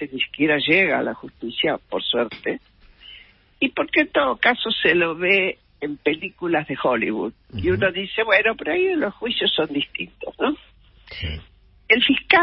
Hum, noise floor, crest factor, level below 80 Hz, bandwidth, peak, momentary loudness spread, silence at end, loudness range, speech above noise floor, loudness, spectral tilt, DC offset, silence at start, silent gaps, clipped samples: none; -48 dBFS; 20 dB; -48 dBFS; 5.8 kHz; -2 dBFS; 14 LU; 0 s; 4 LU; 27 dB; -21 LUFS; -9.5 dB/octave; under 0.1%; 0 s; none; under 0.1%